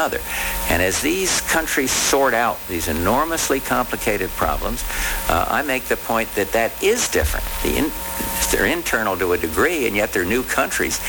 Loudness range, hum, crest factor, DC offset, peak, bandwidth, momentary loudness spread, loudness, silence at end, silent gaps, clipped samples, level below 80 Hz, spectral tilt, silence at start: 2 LU; none; 16 dB; under 0.1%; -4 dBFS; over 20 kHz; 5 LU; -19 LUFS; 0 s; none; under 0.1%; -32 dBFS; -3 dB/octave; 0 s